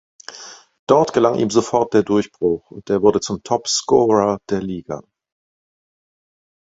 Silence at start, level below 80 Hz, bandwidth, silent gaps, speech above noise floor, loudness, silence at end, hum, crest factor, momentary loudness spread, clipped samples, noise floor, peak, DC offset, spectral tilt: 0.3 s; -54 dBFS; 8 kHz; 0.79-0.87 s; 23 dB; -18 LUFS; 1.7 s; none; 18 dB; 19 LU; under 0.1%; -40 dBFS; 0 dBFS; under 0.1%; -5 dB/octave